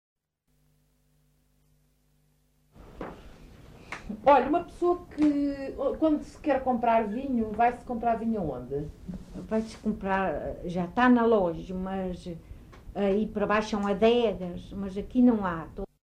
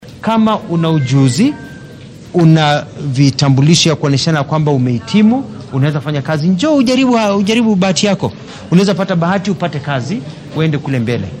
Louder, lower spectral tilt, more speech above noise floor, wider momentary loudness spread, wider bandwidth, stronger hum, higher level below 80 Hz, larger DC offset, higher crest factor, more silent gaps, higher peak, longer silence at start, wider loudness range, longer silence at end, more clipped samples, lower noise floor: second, -27 LUFS vs -13 LUFS; about the same, -7 dB/octave vs -6 dB/octave; first, 45 dB vs 20 dB; first, 18 LU vs 9 LU; second, 9.8 kHz vs 11 kHz; first, 50 Hz at -60 dBFS vs none; about the same, -50 dBFS vs -48 dBFS; neither; first, 18 dB vs 12 dB; neither; second, -10 dBFS vs 0 dBFS; first, 2.8 s vs 0 s; about the same, 3 LU vs 3 LU; first, 0.25 s vs 0 s; neither; first, -72 dBFS vs -33 dBFS